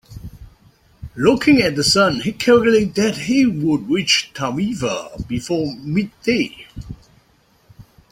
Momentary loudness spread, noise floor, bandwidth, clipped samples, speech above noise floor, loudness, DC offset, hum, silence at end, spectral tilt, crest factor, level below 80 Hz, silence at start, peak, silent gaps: 20 LU; -57 dBFS; 16 kHz; under 0.1%; 39 dB; -17 LUFS; under 0.1%; none; 0.3 s; -4.5 dB/octave; 18 dB; -44 dBFS; 0.1 s; -2 dBFS; none